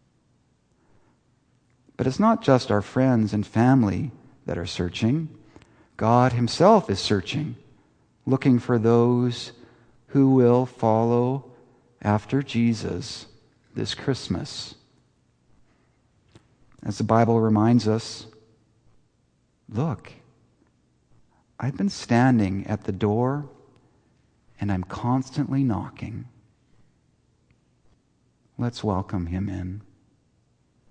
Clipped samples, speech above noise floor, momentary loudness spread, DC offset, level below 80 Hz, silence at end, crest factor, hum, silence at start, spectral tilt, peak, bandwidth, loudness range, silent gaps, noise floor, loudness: under 0.1%; 44 dB; 16 LU; under 0.1%; -56 dBFS; 1.1 s; 22 dB; none; 2 s; -7 dB/octave; -2 dBFS; 9.6 kHz; 11 LU; none; -66 dBFS; -23 LUFS